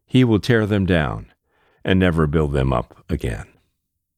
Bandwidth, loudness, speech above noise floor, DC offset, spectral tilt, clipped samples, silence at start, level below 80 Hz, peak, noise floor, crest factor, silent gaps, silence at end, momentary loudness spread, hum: 14.5 kHz; -19 LUFS; 56 dB; under 0.1%; -7.5 dB/octave; under 0.1%; 0.15 s; -34 dBFS; -4 dBFS; -74 dBFS; 16 dB; none; 0.75 s; 12 LU; none